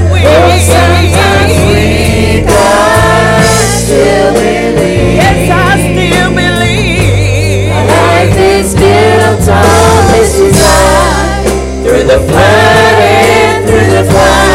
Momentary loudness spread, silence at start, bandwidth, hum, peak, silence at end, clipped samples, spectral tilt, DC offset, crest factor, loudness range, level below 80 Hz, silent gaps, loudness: 4 LU; 0 s; 16.5 kHz; none; 0 dBFS; 0 s; 0.3%; -5 dB/octave; under 0.1%; 6 dB; 2 LU; -18 dBFS; none; -6 LUFS